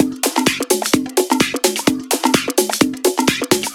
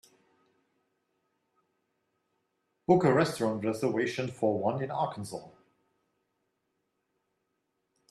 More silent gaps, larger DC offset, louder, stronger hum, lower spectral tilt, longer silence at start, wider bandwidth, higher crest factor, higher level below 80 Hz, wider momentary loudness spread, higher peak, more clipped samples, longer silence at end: neither; neither; first, -16 LUFS vs -29 LUFS; neither; second, -2.5 dB/octave vs -6.5 dB/octave; second, 0 s vs 2.9 s; first, 18.5 kHz vs 13 kHz; about the same, 18 dB vs 22 dB; first, -50 dBFS vs -72 dBFS; second, 2 LU vs 15 LU; first, 0 dBFS vs -10 dBFS; neither; second, 0 s vs 2.6 s